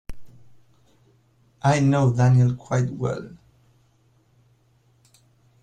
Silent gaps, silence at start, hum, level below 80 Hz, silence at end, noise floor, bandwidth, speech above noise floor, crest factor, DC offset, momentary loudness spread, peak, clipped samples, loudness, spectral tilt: none; 0.1 s; none; -50 dBFS; 2.35 s; -61 dBFS; 9.2 kHz; 42 dB; 18 dB; under 0.1%; 12 LU; -6 dBFS; under 0.1%; -21 LUFS; -7.5 dB/octave